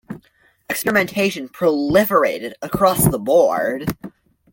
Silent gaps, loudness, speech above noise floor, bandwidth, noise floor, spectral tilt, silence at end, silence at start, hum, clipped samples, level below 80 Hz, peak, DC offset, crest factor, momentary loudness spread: none; -18 LUFS; 40 dB; 17 kHz; -57 dBFS; -5 dB/octave; 0.45 s; 0.1 s; none; under 0.1%; -46 dBFS; -2 dBFS; under 0.1%; 16 dB; 13 LU